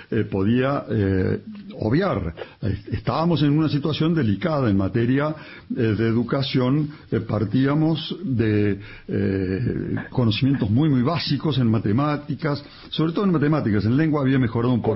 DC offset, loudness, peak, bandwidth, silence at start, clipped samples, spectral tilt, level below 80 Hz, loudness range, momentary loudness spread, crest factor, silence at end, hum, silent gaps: under 0.1%; -22 LUFS; -8 dBFS; 5.8 kHz; 0 s; under 0.1%; -11 dB/octave; -46 dBFS; 1 LU; 8 LU; 12 dB; 0 s; none; none